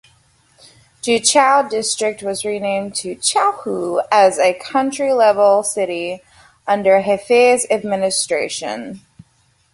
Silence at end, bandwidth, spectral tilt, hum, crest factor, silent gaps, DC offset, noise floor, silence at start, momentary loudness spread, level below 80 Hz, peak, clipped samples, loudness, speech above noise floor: 0.75 s; 11.5 kHz; -2.5 dB/octave; none; 16 dB; none; under 0.1%; -59 dBFS; 1.05 s; 12 LU; -60 dBFS; -2 dBFS; under 0.1%; -16 LUFS; 43 dB